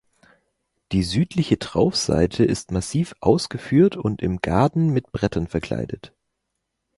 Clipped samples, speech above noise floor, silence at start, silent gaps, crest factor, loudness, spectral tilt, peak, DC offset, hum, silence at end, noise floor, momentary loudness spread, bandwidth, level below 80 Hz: under 0.1%; 57 dB; 0.9 s; none; 20 dB; -22 LUFS; -6 dB/octave; -2 dBFS; under 0.1%; none; 0.9 s; -78 dBFS; 8 LU; 11.5 kHz; -42 dBFS